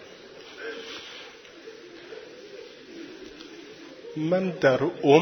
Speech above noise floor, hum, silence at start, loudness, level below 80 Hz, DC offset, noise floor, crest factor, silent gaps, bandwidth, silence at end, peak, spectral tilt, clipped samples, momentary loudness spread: 24 dB; none; 0 s; -26 LUFS; -68 dBFS; under 0.1%; -46 dBFS; 26 dB; none; 17 kHz; 0 s; -2 dBFS; -6 dB/octave; under 0.1%; 22 LU